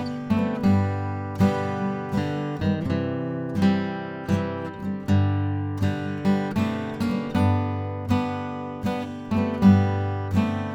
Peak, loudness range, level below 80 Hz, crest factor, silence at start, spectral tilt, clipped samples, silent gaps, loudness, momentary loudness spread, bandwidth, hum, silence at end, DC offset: -4 dBFS; 2 LU; -52 dBFS; 18 dB; 0 s; -8 dB/octave; under 0.1%; none; -25 LUFS; 8 LU; 9 kHz; none; 0 s; under 0.1%